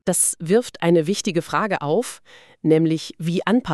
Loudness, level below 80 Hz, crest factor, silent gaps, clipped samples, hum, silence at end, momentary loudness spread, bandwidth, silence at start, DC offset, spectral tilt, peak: -20 LUFS; -58 dBFS; 16 dB; none; under 0.1%; none; 0 s; 7 LU; 13.5 kHz; 0.05 s; 0.2%; -4.5 dB/octave; -4 dBFS